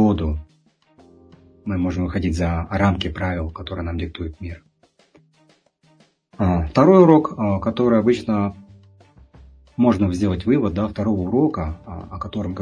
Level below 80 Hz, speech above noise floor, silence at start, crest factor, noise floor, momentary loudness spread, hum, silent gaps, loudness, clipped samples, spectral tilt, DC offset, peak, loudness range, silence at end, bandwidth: -38 dBFS; 40 dB; 0 s; 20 dB; -59 dBFS; 16 LU; none; none; -20 LUFS; under 0.1%; -8 dB/octave; under 0.1%; 0 dBFS; 9 LU; 0 s; 10.5 kHz